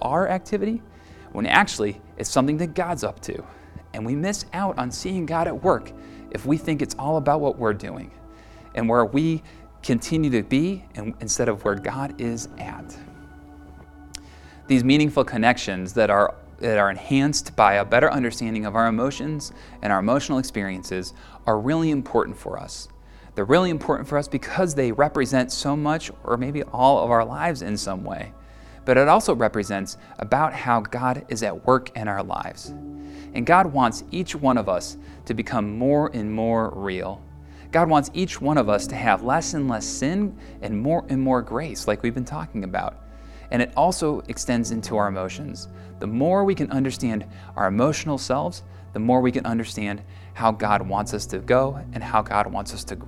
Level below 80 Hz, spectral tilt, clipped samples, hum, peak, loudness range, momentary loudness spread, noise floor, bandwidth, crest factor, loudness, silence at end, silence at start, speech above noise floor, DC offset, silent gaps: -46 dBFS; -5.5 dB/octave; under 0.1%; none; 0 dBFS; 5 LU; 15 LU; -45 dBFS; 14 kHz; 24 dB; -23 LUFS; 0 s; 0 s; 22 dB; under 0.1%; none